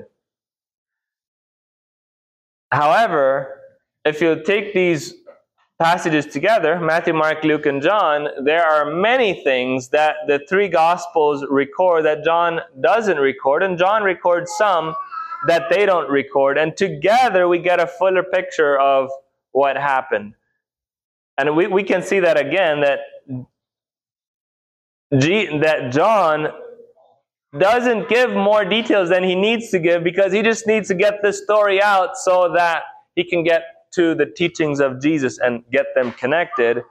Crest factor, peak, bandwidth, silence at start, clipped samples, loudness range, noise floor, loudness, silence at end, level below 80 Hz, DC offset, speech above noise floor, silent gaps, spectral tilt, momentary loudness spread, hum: 14 dB; -4 dBFS; 14 kHz; 2.7 s; under 0.1%; 4 LU; under -90 dBFS; -17 LUFS; 0.1 s; -64 dBFS; under 0.1%; over 73 dB; 21.04-21.37 s, 24.27-25.10 s; -5 dB/octave; 6 LU; none